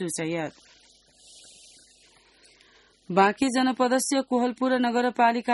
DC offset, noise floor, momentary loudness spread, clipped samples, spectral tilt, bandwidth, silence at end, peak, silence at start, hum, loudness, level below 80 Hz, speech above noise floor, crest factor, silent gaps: under 0.1%; -59 dBFS; 8 LU; under 0.1%; -4 dB/octave; 11.5 kHz; 0 s; -6 dBFS; 0 s; none; -24 LUFS; -68 dBFS; 35 dB; 20 dB; none